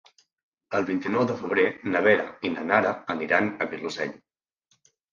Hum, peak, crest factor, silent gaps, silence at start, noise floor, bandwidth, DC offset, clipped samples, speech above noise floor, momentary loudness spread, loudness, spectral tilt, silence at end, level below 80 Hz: none; -4 dBFS; 22 dB; none; 0.7 s; -71 dBFS; 7.4 kHz; under 0.1%; under 0.1%; 46 dB; 9 LU; -25 LUFS; -6 dB/octave; 0.95 s; -66 dBFS